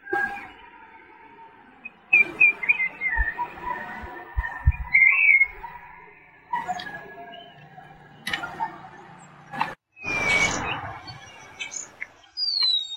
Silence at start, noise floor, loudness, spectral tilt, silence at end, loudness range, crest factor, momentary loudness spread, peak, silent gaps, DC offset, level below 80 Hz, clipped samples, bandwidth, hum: 0.05 s; -50 dBFS; -22 LUFS; -2.5 dB/octave; 0 s; 13 LU; 20 dB; 25 LU; -6 dBFS; none; under 0.1%; -38 dBFS; under 0.1%; 16.5 kHz; none